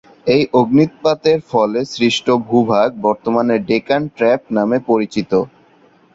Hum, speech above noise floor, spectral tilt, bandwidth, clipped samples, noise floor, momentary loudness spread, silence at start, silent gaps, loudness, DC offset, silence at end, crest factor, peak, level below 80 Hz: none; 35 dB; -6 dB/octave; 7.8 kHz; under 0.1%; -50 dBFS; 5 LU; 0.25 s; none; -16 LUFS; under 0.1%; 0.7 s; 14 dB; -2 dBFS; -54 dBFS